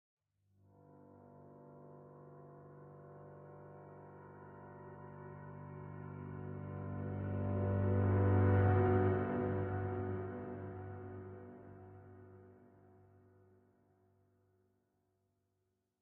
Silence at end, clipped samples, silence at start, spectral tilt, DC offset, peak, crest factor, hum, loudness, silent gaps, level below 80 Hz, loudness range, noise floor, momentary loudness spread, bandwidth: 3.5 s; under 0.1%; 1.15 s; -10 dB/octave; under 0.1%; -20 dBFS; 20 dB; none; -37 LUFS; none; -64 dBFS; 23 LU; -84 dBFS; 26 LU; 3.2 kHz